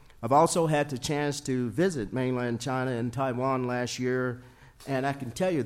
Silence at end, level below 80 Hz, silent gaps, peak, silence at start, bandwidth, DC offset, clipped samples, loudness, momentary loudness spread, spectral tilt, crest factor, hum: 0 s; -56 dBFS; none; -10 dBFS; 0.2 s; 16 kHz; under 0.1%; under 0.1%; -28 LUFS; 7 LU; -5.5 dB/octave; 18 dB; none